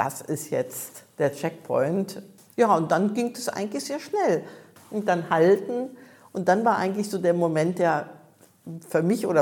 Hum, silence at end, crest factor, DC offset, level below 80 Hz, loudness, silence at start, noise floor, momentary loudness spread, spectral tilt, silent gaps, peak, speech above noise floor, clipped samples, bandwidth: none; 0 s; 18 dB; under 0.1%; -76 dBFS; -25 LUFS; 0 s; -54 dBFS; 15 LU; -6 dB/octave; none; -6 dBFS; 30 dB; under 0.1%; 18.5 kHz